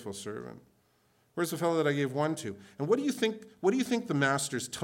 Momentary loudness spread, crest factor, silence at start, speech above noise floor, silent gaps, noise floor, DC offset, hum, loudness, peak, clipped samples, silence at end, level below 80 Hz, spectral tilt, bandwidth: 13 LU; 18 dB; 0 s; 38 dB; none; -69 dBFS; under 0.1%; none; -31 LUFS; -14 dBFS; under 0.1%; 0 s; -76 dBFS; -4.5 dB/octave; 18 kHz